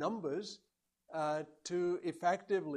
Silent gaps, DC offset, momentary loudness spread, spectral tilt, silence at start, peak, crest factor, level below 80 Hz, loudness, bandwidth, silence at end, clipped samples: none; under 0.1%; 10 LU; -5 dB/octave; 0 s; -20 dBFS; 18 dB; -84 dBFS; -38 LUFS; 11 kHz; 0 s; under 0.1%